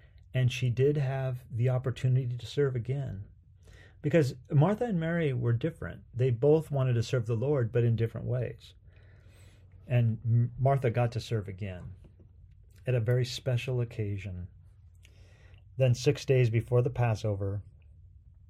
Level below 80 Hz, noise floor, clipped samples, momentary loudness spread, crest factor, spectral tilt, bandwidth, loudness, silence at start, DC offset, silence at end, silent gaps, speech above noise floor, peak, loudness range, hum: -56 dBFS; -55 dBFS; under 0.1%; 13 LU; 18 dB; -7.5 dB/octave; 10.5 kHz; -30 LUFS; 0.35 s; under 0.1%; 0.8 s; none; 27 dB; -12 dBFS; 5 LU; none